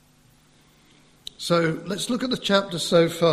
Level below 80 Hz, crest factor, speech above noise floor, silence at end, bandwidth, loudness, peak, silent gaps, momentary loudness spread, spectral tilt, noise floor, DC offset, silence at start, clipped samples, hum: -60 dBFS; 20 dB; 35 dB; 0 s; 14.5 kHz; -23 LUFS; -4 dBFS; none; 13 LU; -4.5 dB/octave; -57 dBFS; under 0.1%; 1.4 s; under 0.1%; none